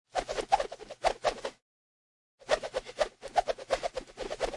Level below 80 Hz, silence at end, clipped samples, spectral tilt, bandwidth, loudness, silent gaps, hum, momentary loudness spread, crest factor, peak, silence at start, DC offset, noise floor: -54 dBFS; 0 s; under 0.1%; -2 dB/octave; 11.5 kHz; -33 LUFS; 1.62-2.38 s; none; 10 LU; 22 dB; -12 dBFS; 0.15 s; under 0.1%; under -90 dBFS